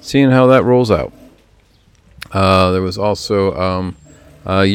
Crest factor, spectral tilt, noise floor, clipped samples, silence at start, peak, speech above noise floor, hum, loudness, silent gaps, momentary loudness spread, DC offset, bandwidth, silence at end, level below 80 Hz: 14 dB; -6.5 dB/octave; -51 dBFS; under 0.1%; 0.05 s; 0 dBFS; 38 dB; none; -14 LUFS; none; 16 LU; under 0.1%; 15 kHz; 0 s; -44 dBFS